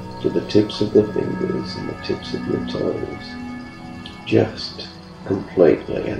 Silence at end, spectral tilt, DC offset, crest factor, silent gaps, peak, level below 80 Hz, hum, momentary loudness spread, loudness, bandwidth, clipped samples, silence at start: 0 s; -7 dB/octave; under 0.1%; 20 dB; none; 0 dBFS; -46 dBFS; none; 17 LU; -21 LUFS; 10 kHz; under 0.1%; 0 s